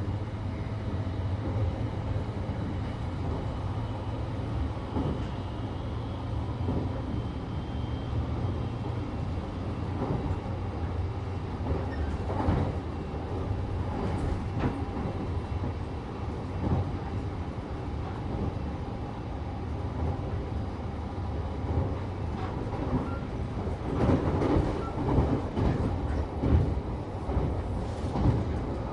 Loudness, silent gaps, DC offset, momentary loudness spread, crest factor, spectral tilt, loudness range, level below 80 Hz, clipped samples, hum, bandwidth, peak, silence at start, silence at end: -32 LUFS; none; under 0.1%; 8 LU; 20 dB; -8.5 dB/octave; 5 LU; -36 dBFS; under 0.1%; none; 9.6 kHz; -12 dBFS; 0 s; 0 s